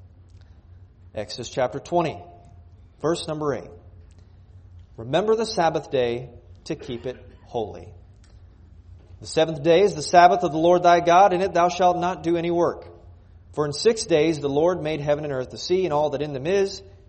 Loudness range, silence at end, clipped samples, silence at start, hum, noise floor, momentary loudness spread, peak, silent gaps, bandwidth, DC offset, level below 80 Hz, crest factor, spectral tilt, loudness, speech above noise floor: 12 LU; 0.2 s; under 0.1%; 0.35 s; none; -48 dBFS; 18 LU; -2 dBFS; none; 8.8 kHz; under 0.1%; -52 dBFS; 22 dB; -5 dB/octave; -22 LUFS; 27 dB